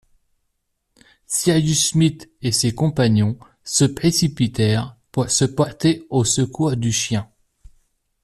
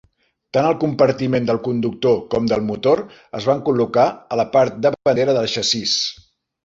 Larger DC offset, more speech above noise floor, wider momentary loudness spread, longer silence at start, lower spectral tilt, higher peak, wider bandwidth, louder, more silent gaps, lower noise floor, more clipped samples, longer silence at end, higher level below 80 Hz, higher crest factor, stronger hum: neither; first, 54 dB vs 31 dB; first, 7 LU vs 4 LU; first, 1.3 s vs 0.55 s; about the same, -4.5 dB/octave vs -5 dB/octave; about the same, -4 dBFS vs -2 dBFS; first, 13.5 kHz vs 7.8 kHz; about the same, -19 LUFS vs -18 LUFS; neither; first, -73 dBFS vs -49 dBFS; neither; first, 1 s vs 0.55 s; first, -48 dBFS vs -54 dBFS; about the same, 16 dB vs 16 dB; neither